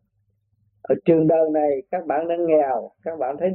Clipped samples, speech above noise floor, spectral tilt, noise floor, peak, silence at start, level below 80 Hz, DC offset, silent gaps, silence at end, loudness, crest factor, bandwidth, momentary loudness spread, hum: under 0.1%; 48 dB; -12 dB/octave; -69 dBFS; -4 dBFS; 0.9 s; -66 dBFS; under 0.1%; none; 0 s; -21 LUFS; 18 dB; 4.1 kHz; 10 LU; none